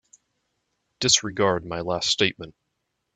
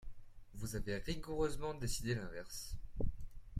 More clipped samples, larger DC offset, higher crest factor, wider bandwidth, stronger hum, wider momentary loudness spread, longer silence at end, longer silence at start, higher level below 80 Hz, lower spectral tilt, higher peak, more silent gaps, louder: neither; neither; first, 24 dB vs 18 dB; second, 9.4 kHz vs 15.5 kHz; neither; first, 13 LU vs 10 LU; first, 0.65 s vs 0 s; first, 1 s vs 0 s; second, -56 dBFS vs -48 dBFS; second, -2 dB/octave vs -5 dB/octave; first, -2 dBFS vs -22 dBFS; neither; first, -22 LUFS vs -43 LUFS